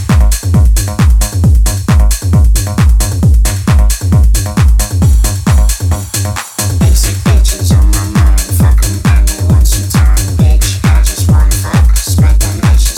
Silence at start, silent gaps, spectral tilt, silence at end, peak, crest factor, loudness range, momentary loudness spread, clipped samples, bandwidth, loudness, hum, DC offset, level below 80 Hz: 0 s; none; -5 dB/octave; 0 s; 0 dBFS; 8 dB; 1 LU; 1 LU; under 0.1%; 17 kHz; -10 LUFS; none; under 0.1%; -10 dBFS